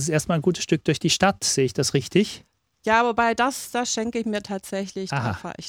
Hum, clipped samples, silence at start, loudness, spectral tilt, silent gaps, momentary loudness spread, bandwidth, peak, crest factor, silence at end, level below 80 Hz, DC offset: none; under 0.1%; 0 s; -23 LUFS; -4 dB/octave; none; 10 LU; 18 kHz; -4 dBFS; 20 dB; 0 s; -54 dBFS; under 0.1%